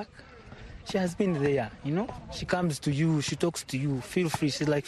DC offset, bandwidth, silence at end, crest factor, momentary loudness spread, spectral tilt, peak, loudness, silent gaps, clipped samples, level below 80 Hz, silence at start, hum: under 0.1%; 12.5 kHz; 0 s; 18 dB; 17 LU; -5.5 dB/octave; -10 dBFS; -29 LUFS; none; under 0.1%; -54 dBFS; 0 s; none